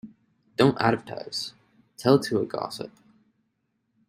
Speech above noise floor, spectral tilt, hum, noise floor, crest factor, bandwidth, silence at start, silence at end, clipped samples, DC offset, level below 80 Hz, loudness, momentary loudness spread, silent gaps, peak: 51 dB; -6 dB/octave; none; -75 dBFS; 22 dB; 16 kHz; 0.05 s; 1.2 s; under 0.1%; under 0.1%; -64 dBFS; -25 LUFS; 15 LU; none; -4 dBFS